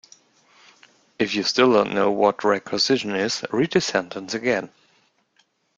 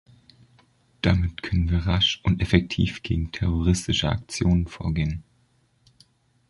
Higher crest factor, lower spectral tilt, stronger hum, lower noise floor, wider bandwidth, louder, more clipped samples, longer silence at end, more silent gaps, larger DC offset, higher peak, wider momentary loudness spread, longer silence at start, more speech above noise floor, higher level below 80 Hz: about the same, 22 dB vs 22 dB; second, -4 dB/octave vs -5.5 dB/octave; neither; about the same, -65 dBFS vs -64 dBFS; second, 9 kHz vs 11.5 kHz; first, -21 LUFS vs -24 LUFS; neither; second, 1.1 s vs 1.3 s; neither; neither; about the same, -2 dBFS vs -2 dBFS; about the same, 9 LU vs 7 LU; first, 1.2 s vs 1.05 s; about the same, 44 dB vs 41 dB; second, -64 dBFS vs -34 dBFS